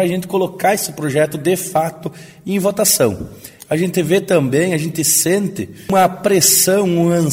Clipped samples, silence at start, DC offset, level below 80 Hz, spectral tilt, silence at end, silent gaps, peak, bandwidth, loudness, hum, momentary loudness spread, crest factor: under 0.1%; 0 s; under 0.1%; -50 dBFS; -4 dB/octave; 0 s; none; 0 dBFS; 16.5 kHz; -15 LUFS; none; 11 LU; 16 dB